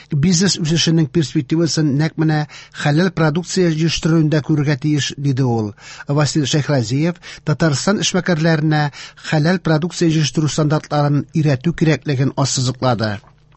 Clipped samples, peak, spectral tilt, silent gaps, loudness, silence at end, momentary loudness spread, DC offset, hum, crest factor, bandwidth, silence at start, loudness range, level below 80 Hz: under 0.1%; -4 dBFS; -5.5 dB/octave; none; -17 LUFS; 0.4 s; 6 LU; under 0.1%; none; 14 dB; 8.4 kHz; 0.1 s; 1 LU; -46 dBFS